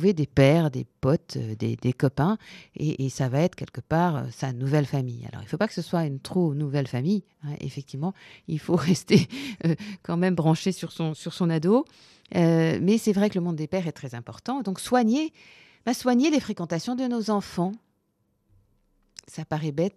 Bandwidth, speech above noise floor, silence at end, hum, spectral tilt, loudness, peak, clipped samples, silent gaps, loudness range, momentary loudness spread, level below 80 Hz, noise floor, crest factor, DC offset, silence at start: 13.5 kHz; 47 dB; 0.05 s; none; -6.5 dB/octave; -26 LUFS; -4 dBFS; under 0.1%; none; 4 LU; 12 LU; -58 dBFS; -72 dBFS; 20 dB; under 0.1%; 0 s